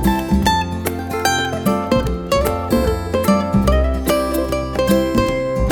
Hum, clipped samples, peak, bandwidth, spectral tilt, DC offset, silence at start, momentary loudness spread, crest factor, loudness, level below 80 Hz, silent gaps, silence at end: none; under 0.1%; -2 dBFS; 19.5 kHz; -5.5 dB/octave; under 0.1%; 0 s; 4 LU; 16 dB; -18 LUFS; -26 dBFS; none; 0 s